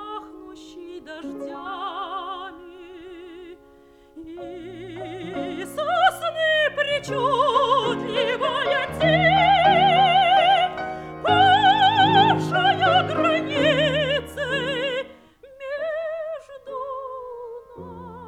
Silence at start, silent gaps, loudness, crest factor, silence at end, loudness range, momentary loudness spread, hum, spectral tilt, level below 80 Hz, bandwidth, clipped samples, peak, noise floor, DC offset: 0 s; none; -20 LUFS; 18 dB; 0 s; 17 LU; 23 LU; none; -5 dB/octave; -54 dBFS; 14 kHz; under 0.1%; -6 dBFS; -51 dBFS; under 0.1%